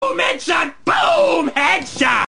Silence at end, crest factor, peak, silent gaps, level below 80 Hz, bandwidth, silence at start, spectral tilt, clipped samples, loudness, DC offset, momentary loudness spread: 0.05 s; 16 dB; -2 dBFS; none; -52 dBFS; 10.5 kHz; 0 s; -2.5 dB/octave; under 0.1%; -16 LUFS; 1%; 4 LU